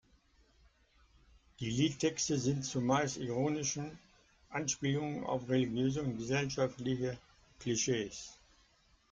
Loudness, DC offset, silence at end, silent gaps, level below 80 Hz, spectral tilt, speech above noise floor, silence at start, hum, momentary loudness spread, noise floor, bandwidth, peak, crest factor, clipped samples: -35 LUFS; under 0.1%; 0.75 s; none; -64 dBFS; -4.5 dB/octave; 34 dB; 1.6 s; none; 11 LU; -69 dBFS; 9.4 kHz; -18 dBFS; 18 dB; under 0.1%